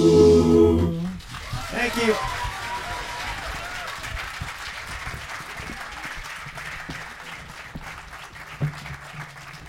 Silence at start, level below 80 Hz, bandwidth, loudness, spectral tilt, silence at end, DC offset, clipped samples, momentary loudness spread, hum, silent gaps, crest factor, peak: 0 s; -40 dBFS; 16 kHz; -25 LUFS; -5.5 dB/octave; 0 s; under 0.1%; under 0.1%; 20 LU; none; none; 20 dB; -4 dBFS